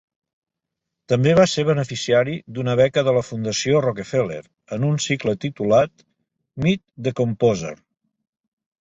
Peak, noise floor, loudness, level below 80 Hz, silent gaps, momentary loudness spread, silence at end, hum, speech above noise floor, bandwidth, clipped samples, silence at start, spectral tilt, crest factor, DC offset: -2 dBFS; -83 dBFS; -20 LUFS; -54 dBFS; none; 10 LU; 1.1 s; none; 63 dB; 8.2 kHz; under 0.1%; 1.1 s; -5.5 dB/octave; 18 dB; under 0.1%